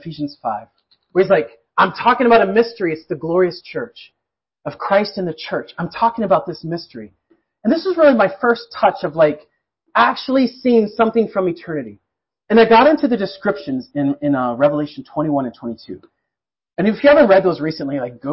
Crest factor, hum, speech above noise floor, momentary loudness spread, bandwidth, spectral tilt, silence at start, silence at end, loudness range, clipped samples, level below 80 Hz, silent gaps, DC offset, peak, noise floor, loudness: 14 dB; none; 67 dB; 16 LU; 5.8 kHz; -10.5 dB/octave; 0.05 s; 0 s; 5 LU; under 0.1%; -56 dBFS; none; under 0.1%; -2 dBFS; -83 dBFS; -17 LUFS